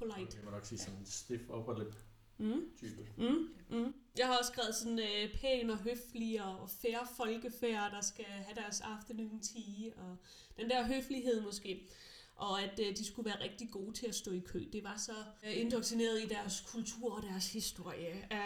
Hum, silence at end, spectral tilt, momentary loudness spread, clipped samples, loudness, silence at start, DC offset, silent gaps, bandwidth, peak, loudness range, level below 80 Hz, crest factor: none; 0 s; -3.5 dB/octave; 11 LU; under 0.1%; -40 LUFS; 0 s; under 0.1%; none; 19 kHz; -20 dBFS; 4 LU; -62 dBFS; 20 dB